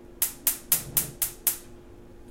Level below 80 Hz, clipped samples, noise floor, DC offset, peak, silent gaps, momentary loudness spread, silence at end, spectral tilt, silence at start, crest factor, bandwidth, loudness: -50 dBFS; under 0.1%; -47 dBFS; under 0.1%; 0 dBFS; none; 6 LU; 0 s; -1 dB/octave; 0 s; 30 dB; 17 kHz; -26 LUFS